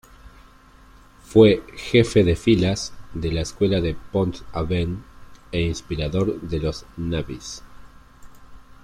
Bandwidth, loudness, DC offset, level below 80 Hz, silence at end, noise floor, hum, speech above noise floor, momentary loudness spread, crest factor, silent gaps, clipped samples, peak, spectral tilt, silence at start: 14 kHz; -22 LUFS; under 0.1%; -40 dBFS; 0.1 s; -49 dBFS; none; 28 dB; 14 LU; 20 dB; none; under 0.1%; -2 dBFS; -6 dB/octave; 0.25 s